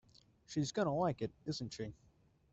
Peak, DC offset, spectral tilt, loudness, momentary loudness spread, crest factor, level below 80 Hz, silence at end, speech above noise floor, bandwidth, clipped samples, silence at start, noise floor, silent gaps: -22 dBFS; under 0.1%; -5.5 dB/octave; -39 LUFS; 11 LU; 18 dB; -68 dBFS; 0.6 s; 32 dB; 8.2 kHz; under 0.1%; 0.5 s; -70 dBFS; none